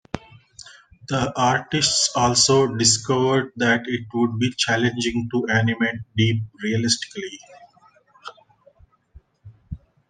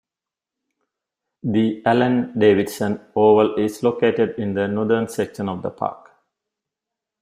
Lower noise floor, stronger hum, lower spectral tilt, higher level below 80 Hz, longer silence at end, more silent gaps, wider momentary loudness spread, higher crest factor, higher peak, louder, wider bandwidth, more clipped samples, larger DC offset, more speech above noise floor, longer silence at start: second, -56 dBFS vs -88 dBFS; neither; second, -3.5 dB/octave vs -6.5 dB/octave; first, -52 dBFS vs -62 dBFS; second, 0.35 s vs 1.25 s; neither; first, 21 LU vs 11 LU; about the same, 20 dB vs 18 dB; about the same, -4 dBFS vs -2 dBFS; about the same, -20 LUFS vs -20 LUFS; second, 10 kHz vs 15.5 kHz; neither; neither; second, 35 dB vs 69 dB; second, 0.15 s vs 1.45 s